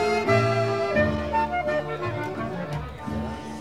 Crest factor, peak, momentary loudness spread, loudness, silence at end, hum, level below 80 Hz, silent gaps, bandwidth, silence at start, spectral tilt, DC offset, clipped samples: 18 dB; -8 dBFS; 11 LU; -26 LUFS; 0 s; none; -44 dBFS; none; 14 kHz; 0 s; -6.5 dB/octave; 0.3%; under 0.1%